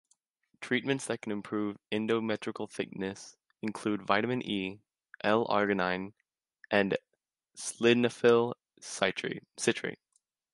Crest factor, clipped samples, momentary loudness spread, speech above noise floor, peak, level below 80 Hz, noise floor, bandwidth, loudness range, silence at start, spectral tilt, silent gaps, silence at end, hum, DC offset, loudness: 24 dB; under 0.1%; 14 LU; 53 dB; -8 dBFS; -70 dBFS; -83 dBFS; 11.5 kHz; 4 LU; 0.6 s; -4.5 dB/octave; none; 0.6 s; none; under 0.1%; -31 LUFS